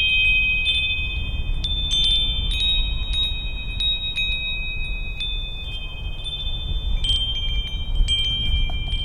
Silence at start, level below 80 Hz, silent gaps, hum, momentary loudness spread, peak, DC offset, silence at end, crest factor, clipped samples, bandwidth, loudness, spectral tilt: 0 s; -26 dBFS; none; none; 12 LU; -8 dBFS; under 0.1%; 0 s; 14 dB; under 0.1%; 10.5 kHz; -22 LUFS; -2.5 dB/octave